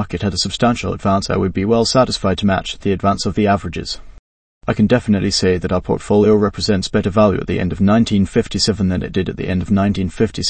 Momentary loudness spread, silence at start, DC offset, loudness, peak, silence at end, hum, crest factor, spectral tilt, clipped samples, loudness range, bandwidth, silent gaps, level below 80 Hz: 7 LU; 0 s; under 0.1%; -16 LUFS; 0 dBFS; 0 s; none; 16 dB; -5.5 dB/octave; under 0.1%; 2 LU; 8.8 kHz; 4.19-4.61 s; -36 dBFS